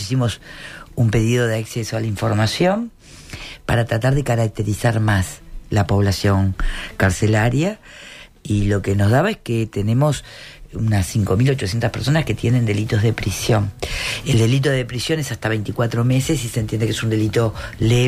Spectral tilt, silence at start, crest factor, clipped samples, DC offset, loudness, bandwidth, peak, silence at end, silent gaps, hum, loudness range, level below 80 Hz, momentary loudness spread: -6 dB/octave; 0 s; 12 dB; under 0.1%; under 0.1%; -19 LUFS; 15 kHz; -6 dBFS; 0 s; none; none; 2 LU; -34 dBFS; 12 LU